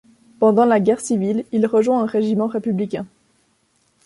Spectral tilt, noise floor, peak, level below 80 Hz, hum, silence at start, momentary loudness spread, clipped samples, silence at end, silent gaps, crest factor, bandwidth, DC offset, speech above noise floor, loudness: -7 dB/octave; -63 dBFS; -4 dBFS; -64 dBFS; none; 0.4 s; 9 LU; under 0.1%; 1 s; none; 16 dB; 11.5 kHz; under 0.1%; 46 dB; -18 LUFS